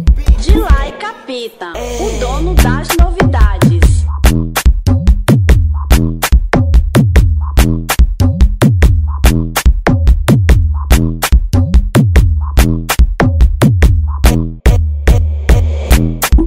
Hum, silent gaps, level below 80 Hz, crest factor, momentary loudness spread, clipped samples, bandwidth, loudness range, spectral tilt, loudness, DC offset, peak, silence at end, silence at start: none; none; -12 dBFS; 10 dB; 4 LU; 0.2%; 16.5 kHz; 1 LU; -6 dB/octave; -12 LUFS; under 0.1%; 0 dBFS; 0 s; 0 s